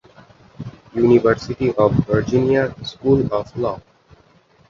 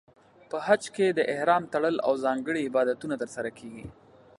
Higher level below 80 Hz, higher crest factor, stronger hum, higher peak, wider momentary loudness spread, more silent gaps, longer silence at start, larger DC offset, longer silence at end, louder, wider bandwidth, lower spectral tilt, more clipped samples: first, -44 dBFS vs -64 dBFS; about the same, 18 dB vs 20 dB; neither; first, -2 dBFS vs -8 dBFS; about the same, 17 LU vs 15 LU; neither; about the same, 0.6 s vs 0.5 s; neither; first, 0.9 s vs 0.45 s; first, -18 LUFS vs -27 LUFS; second, 7.2 kHz vs 11.5 kHz; first, -8 dB/octave vs -5 dB/octave; neither